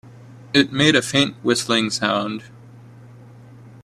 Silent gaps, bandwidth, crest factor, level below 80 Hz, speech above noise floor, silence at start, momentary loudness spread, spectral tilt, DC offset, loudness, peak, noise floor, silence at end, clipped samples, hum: none; 13.5 kHz; 22 dB; -58 dBFS; 24 dB; 0.05 s; 8 LU; -3.5 dB/octave; under 0.1%; -18 LUFS; 0 dBFS; -43 dBFS; 0.15 s; under 0.1%; none